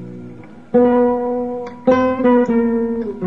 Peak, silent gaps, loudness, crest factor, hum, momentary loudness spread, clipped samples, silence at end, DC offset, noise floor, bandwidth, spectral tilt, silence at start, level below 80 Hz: -4 dBFS; none; -16 LUFS; 14 dB; none; 14 LU; under 0.1%; 0 s; 0.7%; -37 dBFS; 6 kHz; -8.5 dB/octave; 0 s; -48 dBFS